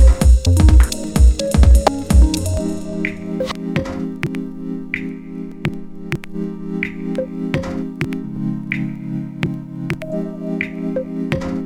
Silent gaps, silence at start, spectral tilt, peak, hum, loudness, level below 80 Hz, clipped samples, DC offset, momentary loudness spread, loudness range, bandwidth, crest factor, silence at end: none; 0 s; -6.5 dB/octave; 0 dBFS; none; -19 LUFS; -18 dBFS; under 0.1%; under 0.1%; 14 LU; 10 LU; 13.5 kHz; 16 dB; 0 s